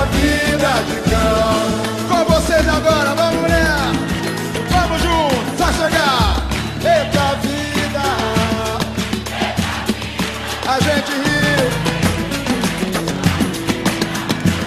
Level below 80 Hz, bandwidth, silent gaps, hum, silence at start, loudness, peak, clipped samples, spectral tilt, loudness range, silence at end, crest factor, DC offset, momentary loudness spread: -28 dBFS; 13.5 kHz; none; none; 0 s; -17 LUFS; -2 dBFS; under 0.1%; -4.5 dB/octave; 3 LU; 0 s; 14 dB; under 0.1%; 6 LU